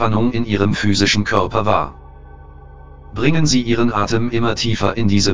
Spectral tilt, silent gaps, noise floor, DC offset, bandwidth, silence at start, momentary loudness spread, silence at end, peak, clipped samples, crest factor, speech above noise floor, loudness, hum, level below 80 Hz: -5 dB/octave; none; -38 dBFS; 5%; 7.6 kHz; 0 s; 4 LU; 0 s; 0 dBFS; under 0.1%; 16 dB; 22 dB; -17 LUFS; none; -36 dBFS